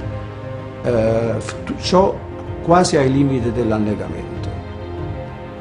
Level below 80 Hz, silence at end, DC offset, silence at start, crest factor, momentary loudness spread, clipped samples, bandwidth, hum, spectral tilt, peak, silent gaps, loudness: -38 dBFS; 0 s; under 0.1%; 0 s; 18 dB; 15 LU; under 0.1%; 11 kHz; none; -6 dB/octave; 0 dBFS; none; -19 LUFS